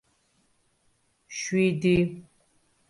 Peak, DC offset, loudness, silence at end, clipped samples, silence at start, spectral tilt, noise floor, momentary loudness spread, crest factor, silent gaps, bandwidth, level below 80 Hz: -12 dBFS; under 0.1%; -26 LUFS; 0.7 s; under 0.1%; 1.3 s; -6 dB/octave; -69 dBFS; 16 LU; 18 dB; none; 11.5 kHz; -56 dBFS